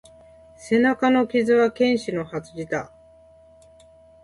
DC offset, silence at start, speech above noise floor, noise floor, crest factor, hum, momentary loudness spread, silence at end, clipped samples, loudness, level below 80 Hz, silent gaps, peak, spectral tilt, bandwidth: under 0.1%; 0.6 s; 31 dB; -51 dBFS; 16 dB; none; 13 LU; 1.4 s; under 0.1%; -21 LUFS; -58 dBFS; none; -8 dBFS; -5.5 dB/octave; 11.5 kHz